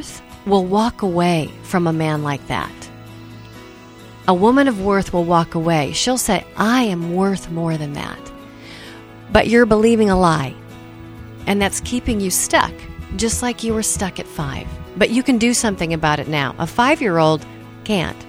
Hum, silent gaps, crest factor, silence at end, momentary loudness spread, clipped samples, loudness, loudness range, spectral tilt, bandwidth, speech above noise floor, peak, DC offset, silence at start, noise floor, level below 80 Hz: none; none; 18 dB; 0 s; 23 LU; under 0.1%; -18 LUFS; 3 LU; -4.5 dB/octave; 16.5 kHz; 22 dB; 0 dBFS; under 0.1%; 0 s; -39 dBFS; -38 dBFS